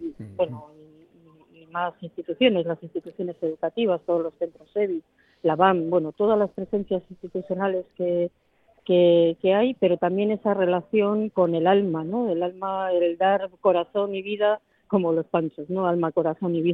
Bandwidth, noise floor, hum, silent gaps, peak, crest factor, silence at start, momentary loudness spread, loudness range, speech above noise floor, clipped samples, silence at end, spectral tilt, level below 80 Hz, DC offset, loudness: 4.3 kHz; -55 dBFS; none; none; -4 dBFS; 20 dB; 0 s; 11 LU; 5 LU; 32 dB; under 0.1%; 0 s; -9.5 dB/octave; -66 dBFS; under 0.1%; -24 LUFS